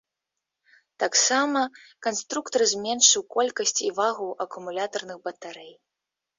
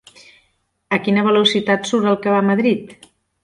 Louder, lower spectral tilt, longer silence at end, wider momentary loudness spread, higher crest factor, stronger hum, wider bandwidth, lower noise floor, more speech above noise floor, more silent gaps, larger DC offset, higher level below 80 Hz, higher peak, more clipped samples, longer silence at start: second, -24 LUFS vs -17 LUFS; second, 0 dB/octave vs -5 dB/octave; first, 0.65 s vs 0.5 s; first, 18 LU vs 7 LU; first, 22 dB vs 16 dB; neither; second, 7.8 kHz vs 11 kHz; first, -86 dBFS vs -65 dBFS; first, 60 dB vs 48 dB; neither; neither; second, -74 dBFS vs -62 dBFS; about the same, -4 dBFS vs -2 dBFS; neither; about the same, 1 s vs 0.9 s